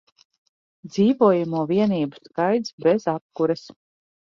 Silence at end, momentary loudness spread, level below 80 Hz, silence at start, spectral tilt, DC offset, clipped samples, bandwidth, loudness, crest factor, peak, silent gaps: 0.6 s; 10 LU; -66 dBFS; 0.85 s; -7.5 dB/octave; under 0.1%; under 0.1%; 7.2 kHz; -22 LUFS; 18 dB; -4 dBFS; 2.73-2.78 s, 3.21-3.30 s